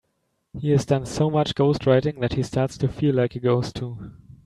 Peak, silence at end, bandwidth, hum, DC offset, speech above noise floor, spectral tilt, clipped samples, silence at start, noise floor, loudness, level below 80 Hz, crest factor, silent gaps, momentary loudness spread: -4 dBFS; 0.15 s; 11.5 kHz; none; under 0.1%; 51 dB; -7 dB/octave; under 0.1%; 0.55 s; -73 dBFS; -23 LUFS; -48 dBFS; 18 dB; none; 13 LU